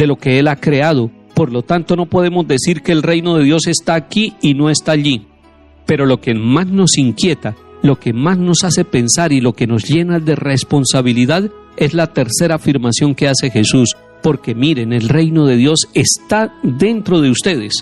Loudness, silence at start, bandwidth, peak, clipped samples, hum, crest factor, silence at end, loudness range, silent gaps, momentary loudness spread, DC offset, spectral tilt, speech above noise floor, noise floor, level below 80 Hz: -13 LUFS; 0 s; 12.5 kHz; 0 dBFS; under 0.1%; none; 12 dB; 0 s; 1 LU; none; 5 LU; under 0.1%; -5 dB/octave; 32 dB; -44 dBFS; -46 dBFS